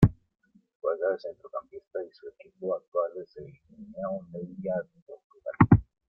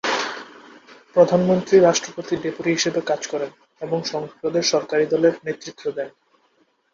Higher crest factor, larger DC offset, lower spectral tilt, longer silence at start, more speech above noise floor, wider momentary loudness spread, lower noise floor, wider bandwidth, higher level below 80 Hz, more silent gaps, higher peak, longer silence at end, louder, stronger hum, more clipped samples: first, 26 dB vs 20 dB; neither; first, -10.5 dB/octave vs -4.5 dB/octave; about the same, 0 s vs 0.05 s; second, 31 dB vs 43 dB; first, 24 LU vs 15 LU; about the same, -66 dBFS vs -63 dBFS; second, 5.6 kHz vs 7.6 kHz; first, -48 dBFS vs -64 dBFS; first, 0.75-0.80 s, 2.88-2.92 s, 5.02-5.06 s, 5.24-5.30 s vs none; about the same, -4 dBFS vs -2 dBFS; second, 0.25 s vs 0.85 s; second, -30 LUFS vs -21 LUFS; neither; neither